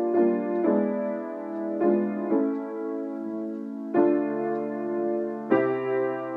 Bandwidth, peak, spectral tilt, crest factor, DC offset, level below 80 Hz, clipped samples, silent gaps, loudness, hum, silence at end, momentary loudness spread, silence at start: 3.8 kHz; -8 dBFS; -10 dB/octave; 18 dB; under 0.1%; -86 dBFS; under 0.1%; none; -27 LUFS; none; 0 s; 9 LU; 0 s